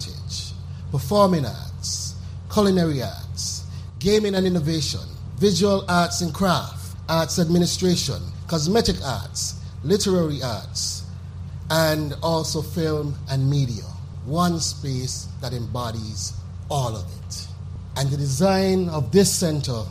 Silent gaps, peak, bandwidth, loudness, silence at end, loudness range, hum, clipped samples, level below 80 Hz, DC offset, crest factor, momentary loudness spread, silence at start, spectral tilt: none; -4 dBFS; 15.5 kHz; -23 LUFS; 0 s; 5 LU; none; under 0.1%; -44 dBFS; under 0.1%; 18 dB; 13 LU; 0 s; -5 dB/octave